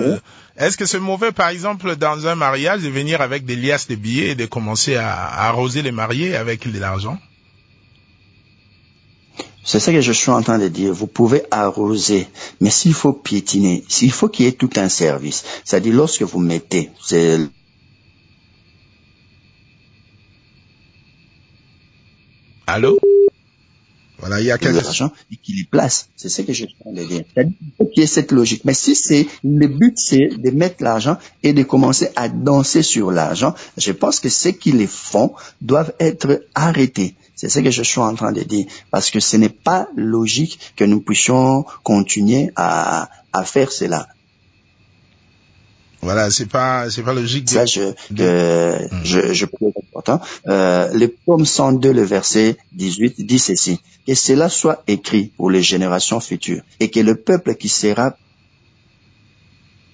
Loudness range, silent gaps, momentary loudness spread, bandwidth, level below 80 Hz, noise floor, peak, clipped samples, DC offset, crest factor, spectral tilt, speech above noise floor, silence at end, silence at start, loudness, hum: 6 LU; none; 9 LU; 8 kHz; -48 dBFS; -55 dBFS; -2 dBFS; under 0.1%; under 0.1%; 16 dB; -4.5 dB/octave; 39 dB; 1.8 s; 0 s; -16 LUFS; none